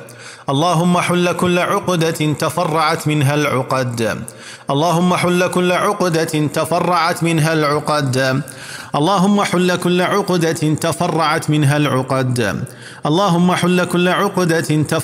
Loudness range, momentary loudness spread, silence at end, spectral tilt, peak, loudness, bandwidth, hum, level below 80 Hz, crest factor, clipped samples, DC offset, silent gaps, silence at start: 1 LU; 7 LU; 0 s; -5.5 dB/octave; -2 dBFS; -16 LUFS; 16 kHz; none; -58 dBFS; 14 dB; under 0.1%; under 0.1%; none; 0 s